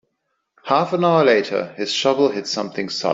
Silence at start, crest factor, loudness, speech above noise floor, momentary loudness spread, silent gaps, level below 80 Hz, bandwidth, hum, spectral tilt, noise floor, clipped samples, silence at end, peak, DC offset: 0.65 s; 16 dB; -19 LUFS; 55 dB; 9 LU; none; -66 dBFS; 7.8 kHz; none; -4.5 dB/octave; -73 dBFS; under 0.1%; 0 s; -2 dBFS; under 0.1%